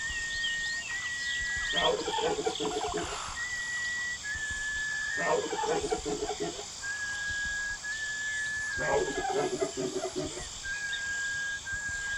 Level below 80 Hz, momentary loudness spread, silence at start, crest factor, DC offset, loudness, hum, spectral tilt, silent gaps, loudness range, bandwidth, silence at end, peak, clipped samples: -52 dBFS; 5 LU; 0 s; 16 dB; under 0.1%; -32 LUFS; none; -2 dB/octave; none; 2 LU; 16.5 kHz; 0 s; -16 dBFS; under 0.1%